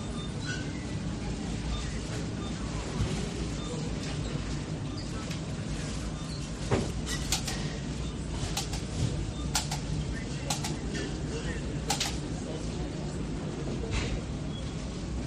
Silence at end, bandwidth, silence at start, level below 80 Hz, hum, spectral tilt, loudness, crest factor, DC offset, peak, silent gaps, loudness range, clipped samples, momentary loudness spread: 0 s; 13.5 kHz; 0 s; -40 dBFS; none; -4.5 dB/octave; -34 LUFS; 22 dB; under 0.1%; -12 dBFS; none; 2 LU; under 0.1%; 5 LU